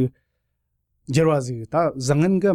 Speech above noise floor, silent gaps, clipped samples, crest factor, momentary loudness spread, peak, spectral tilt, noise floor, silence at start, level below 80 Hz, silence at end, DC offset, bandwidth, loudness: 54 dB; none; under 0.1%; 14 dB; 6 LU; -8 dBFS; -7 dB/octave; -74 dBFS; 0 s; -52 dBFS; 0 s; under 0.1%; 13.5 kHz; -21 LUFS